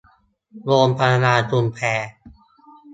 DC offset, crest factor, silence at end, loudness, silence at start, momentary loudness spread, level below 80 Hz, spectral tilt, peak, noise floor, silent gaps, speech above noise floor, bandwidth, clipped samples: under 0.1%; 20 dB; 0 s; -18 LUFS; 0.55 s; 12 LU; -56 dBFS; -6 dB/octave; -2 dBFS; -58 dBFS; none; 40 dB; 8 kHz; under 0.1%